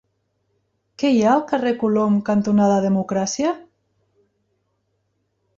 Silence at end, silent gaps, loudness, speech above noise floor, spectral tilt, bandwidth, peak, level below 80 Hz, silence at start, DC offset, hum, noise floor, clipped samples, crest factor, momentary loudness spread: 1.95 s; none; -19 LUFS; 52 dB; -6 dB/octave; 7.6 kHz; -6 dBFS; -62 dBFS; 1 s; under 0.1%; none; -70 dBFS; under 0.1%; 16 dB; 7 LU